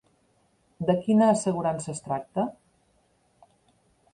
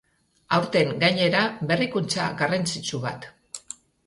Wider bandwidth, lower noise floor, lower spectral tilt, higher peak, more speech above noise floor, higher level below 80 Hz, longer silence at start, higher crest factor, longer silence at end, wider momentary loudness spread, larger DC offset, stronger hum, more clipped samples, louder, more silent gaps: about the same, 10.5 kHz vs 11.5 kHz; first, -67 dBFS vs -44 dBFS; first, -6.5 dB/octave vs -4.5 dB/octave; second, -10 dBFS vs -6 dBFS; first, 42 dB vs 20 dB; about the same, -64 dBFS vs -62 dBFS; first, 0.8 s vs 0.5 s; about the same, 18 dB vs 18 dB; first, 1.6 s vs 0.5 s; second, 12 LU vs 18 LU; neither; neither; neither; second, -26 LUFS vs -23 LUFS; neither